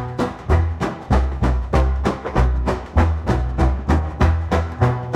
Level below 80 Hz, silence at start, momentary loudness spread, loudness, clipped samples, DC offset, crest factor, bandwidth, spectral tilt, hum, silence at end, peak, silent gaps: -22 dBFS; 0 s; 4 LU; -20 LUFS; under 0.1%; under 0.1%; 14 dB; 9 kHz; -8 dB/octave; none; 0 s; -4 dBFS; none